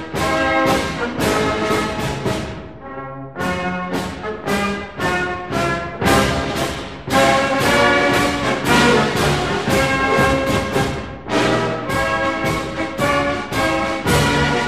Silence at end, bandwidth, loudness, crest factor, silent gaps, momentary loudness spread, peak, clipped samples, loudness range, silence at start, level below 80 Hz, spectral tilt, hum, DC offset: 0 s; 15.5 kHz; -18 LUFS; 16 dB; none; 10 LU; -2 dBFS; under 0.1%; 7 LU; 0 s; -36 dBFS; -4.5 dB/octave; none; 0.5%